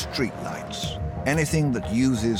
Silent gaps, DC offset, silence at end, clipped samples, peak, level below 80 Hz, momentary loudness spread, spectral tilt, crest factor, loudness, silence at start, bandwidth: none; under 0.1%; 0 s; under 0.1%; -10 dBFS; -40 dBFS; 8 LU; -5.5 dB/octave; 14 dB; -25 LUFS; 0 s; 17 kHz